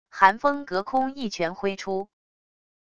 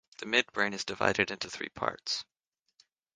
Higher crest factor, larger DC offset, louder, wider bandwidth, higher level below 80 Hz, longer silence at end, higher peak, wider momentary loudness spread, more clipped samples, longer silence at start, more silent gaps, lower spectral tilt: about the same, 24 dB vs 26 dB; first, 0.4% vs under 0.1%; first, -25 LUFS vs -31 LUFS; about the same, 10 kHz vs 10 kHz; about the same, -60 dBFS vs -64 dBFS; second, 0.65 s vs 0.95 s; first, -2 dBFS vs -8 dBFS; first, 12 LU vs 7 LU; neither; second, 0.05 s vs 0.2 s; neither; first, -4.5 dB/octave vs -2.5 dB/octave